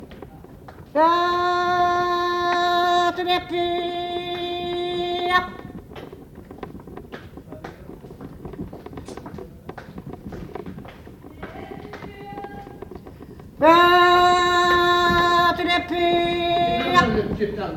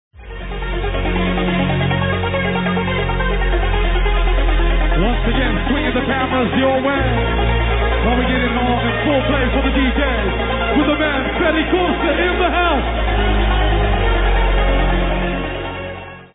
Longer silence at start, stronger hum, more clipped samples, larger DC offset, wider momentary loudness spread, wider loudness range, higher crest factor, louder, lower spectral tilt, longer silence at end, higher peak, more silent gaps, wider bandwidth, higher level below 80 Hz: second, 0 s vs 0.15 s; neither; neither; neither; first, 23 LU vs 5 LU; first, 21 LU vs 2 LU; first, 20 dB vs 14 dB; about the same, -19 LUFS vs -17 LUFS; second, -4.5 dB/octave vs -10 dB/octave; about the same, 0 s vs 0.1 s; about the same, -2 dBFS vs -2 dBFS; neither; first, 16 kHz vs 4 kHz; second, -46 dBFS vs -20 dBFS